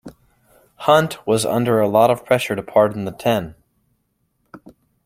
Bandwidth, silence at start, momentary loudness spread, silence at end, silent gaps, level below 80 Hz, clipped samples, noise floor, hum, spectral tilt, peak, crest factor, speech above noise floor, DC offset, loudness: 16.5 kHz; 0.05 s; 8 LU; 0.5 s; none; -56 dBFS; under 0.1%; -68 dBFS; none; -5.5 dB/octave; -2 dBFS; 18 dB; 51 dB; under 0.1%; -18 LUFS